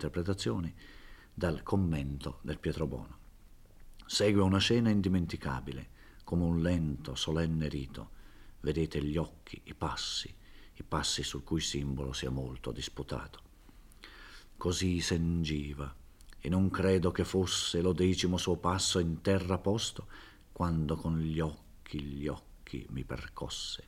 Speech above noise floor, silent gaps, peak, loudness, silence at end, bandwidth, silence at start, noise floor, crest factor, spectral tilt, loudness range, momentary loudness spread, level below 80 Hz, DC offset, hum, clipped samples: 23 dB; none; -14 dBFS; -33 LUFS; 0.05 s; 16 kHz; 0 s; -56 dBFS; 18 dB; -5 dB/octave; 7 LU; 18 LU; -50 dBFS; under 0.1%; none; under 0.1%